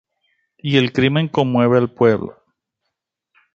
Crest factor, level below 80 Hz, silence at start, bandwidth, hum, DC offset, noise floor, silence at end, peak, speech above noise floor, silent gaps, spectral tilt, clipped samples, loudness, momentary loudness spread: 18 dB; -54 dBFS; 0.65 s; 7.6 kHz; none; under 0.1%; -78 dBFS; 1.25 s; -2 dBFS; 62 dB; none; -7.5 dB/octave; under 0.1%; -17 LUFS; 9 LU